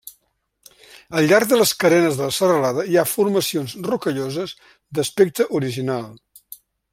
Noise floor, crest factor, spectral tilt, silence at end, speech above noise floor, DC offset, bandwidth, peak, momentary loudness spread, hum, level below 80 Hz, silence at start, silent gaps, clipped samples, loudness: -67 dBFS; 18 dB; -4.5 dB/octave; 0.4 s; 49 dB; under 0.1%; 16.5 kHz; -2 dBFS; 11 LU; none; -62 dBFS; 0.05 s; none; under 0.1%; -19 LUFS